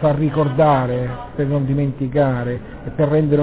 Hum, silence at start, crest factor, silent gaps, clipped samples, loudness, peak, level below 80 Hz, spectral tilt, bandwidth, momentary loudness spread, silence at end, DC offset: none; 0 s; 16 dB; none; under 0.1%; -19 LUFS; -2 dBFS; -40 dBFS; -12.5 dB/octave; 4 kHz; 11 LU; 0 s; 0.4%